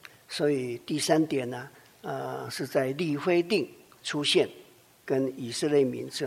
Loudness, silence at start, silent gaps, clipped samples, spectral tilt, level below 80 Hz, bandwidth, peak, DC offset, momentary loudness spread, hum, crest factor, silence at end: -28 LUFS; 0.3 s; none; under 0.1%; -4.5 dB/octave; -74 dBFS; 16 kHz; -8 dBFS; under 0.1%; 13 LU; none; 20 dB; 0 s